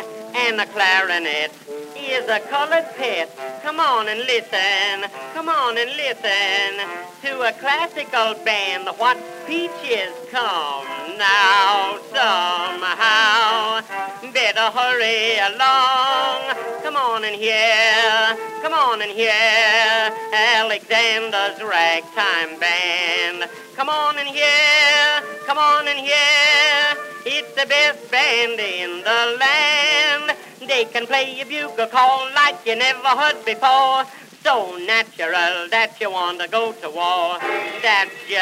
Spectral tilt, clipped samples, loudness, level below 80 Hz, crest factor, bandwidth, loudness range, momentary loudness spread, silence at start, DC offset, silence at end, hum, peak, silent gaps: -0.5 dB/octave; under 0.1%; -17 LUFS; -82 dBFS; 18 dB; 16 kHz; 5 LU; 11 LU; 0 s; under 0.1%; 0 s; none; -2 dBFS; none